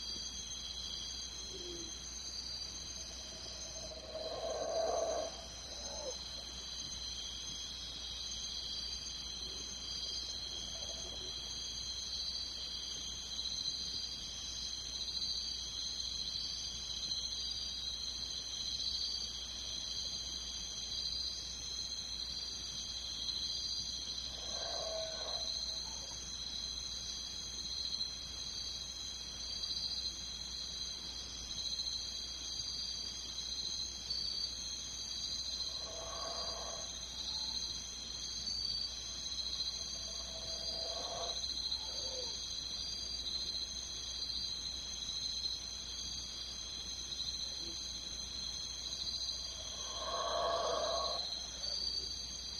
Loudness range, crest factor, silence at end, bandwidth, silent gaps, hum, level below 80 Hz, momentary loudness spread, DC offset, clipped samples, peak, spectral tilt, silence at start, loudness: 3 LU; 18 dB; 0 s; 13 kHz; none; none; -56 dBFS; 5 LU; under 0.1%; under 0.1%; -24 dBFS; -1 dB/octave; 0 s; -39 LUFS